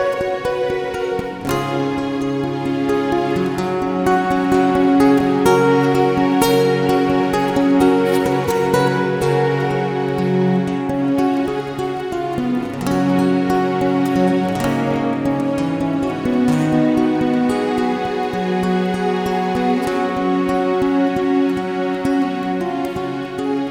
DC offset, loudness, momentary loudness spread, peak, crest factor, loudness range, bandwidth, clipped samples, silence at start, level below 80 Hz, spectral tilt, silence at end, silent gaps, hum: under 0.1%; -18 LUFS; 7 LU; 0 dBFS; 16 dB; 4 LU; 17.5 kHz; under 0.1%; 0 s; -46 dBFS; -6.5 dB/octave; 0 s; none; none